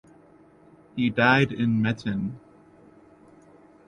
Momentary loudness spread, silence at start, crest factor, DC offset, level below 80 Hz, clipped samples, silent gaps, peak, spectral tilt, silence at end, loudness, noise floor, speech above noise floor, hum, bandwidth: 16 LU; 0.95 s; 20 dB; under 0.1%; -58 dBFS; under 0.1%; none; -8 dBFS; -7 dB/octave; 1.5 s; -24 LUFS; -54 dBFS; 31 dB; none; 9.4 kHz